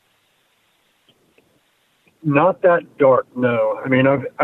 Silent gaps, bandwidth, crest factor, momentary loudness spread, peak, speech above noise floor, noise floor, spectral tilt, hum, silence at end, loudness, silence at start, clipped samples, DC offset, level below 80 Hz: none; 4 kHz; 16 dB; 5 LU; -4 dBFS; 46 dB; -62 dBFS; -9.5 dB/octave; none; 0 s; -17 LUFS; 2.25 s; under 0.1%; under 0.1%; -64 dBFS